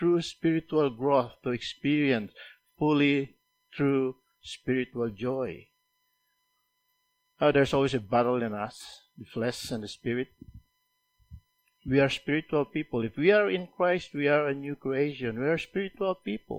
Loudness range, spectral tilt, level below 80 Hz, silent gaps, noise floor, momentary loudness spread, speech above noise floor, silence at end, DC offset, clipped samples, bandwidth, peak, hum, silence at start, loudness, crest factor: 7 LU; -6.5 dB/octave; -60 dBFS; none; -76 dBFS; 14 LU; 48 dB; 0 s; under 0.1%; under 0.1%; 15 kHz; -10 dBFS; none; 0 s; -28 LUFS; 20 dB